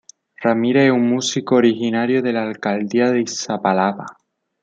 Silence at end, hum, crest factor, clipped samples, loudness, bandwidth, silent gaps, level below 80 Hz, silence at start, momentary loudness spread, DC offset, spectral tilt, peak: 0.5 s; none; 16 dB; under 0.1%; -18 LUFS; 8.8 kHz; none; -68 dBFS; 0.4 s; 8 LU; under 0.1%; -5 dB/octave; -2 dBFS